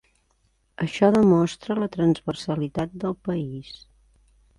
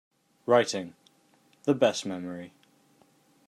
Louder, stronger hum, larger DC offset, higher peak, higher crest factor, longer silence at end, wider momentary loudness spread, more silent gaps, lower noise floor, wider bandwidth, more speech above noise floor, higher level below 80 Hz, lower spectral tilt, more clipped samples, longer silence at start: first, -23 LUFS vs -27 LUFS; neither; neither; about the same, -6 dBFS vs -8 dBFS; about the same, 18 dB vs 22 dB; second, 0.85 s vs 1 s; second, 16 LU vs 19 LU; neither; about the same, -67 dBFS vs -64 dBFS; about the same, 11.5 kHz vs 12.5 kHz; first, 44 dB vs 38 dB; first, -54 dBFS vs -80 dBFS; first, -7.5 dB/octave vs -4.5 dB/octave; neither; first, 0.8 s vs 0.45 s